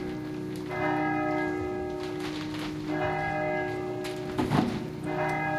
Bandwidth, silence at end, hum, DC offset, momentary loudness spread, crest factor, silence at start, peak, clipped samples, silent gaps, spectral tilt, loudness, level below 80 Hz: 16 kHz; 0 s; none; under 0.1%; 7 LU; 20 dB; 0 s; -10 dBFS; under 0.1%; none; -6.5 dB/octave; -31 LUFS; -52 dBFS